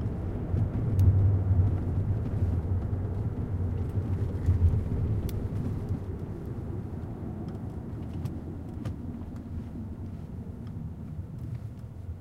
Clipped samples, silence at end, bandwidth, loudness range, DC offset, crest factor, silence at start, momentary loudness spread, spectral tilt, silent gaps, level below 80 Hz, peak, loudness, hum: under 0.1%; 0 s; 4.6 kHz; 11 LU; under 0.1%; 18 dB; 0 s; 14 LU; -10 dB/octave; none; -38 dBFS; -12 dBFS; -31 LUFS; none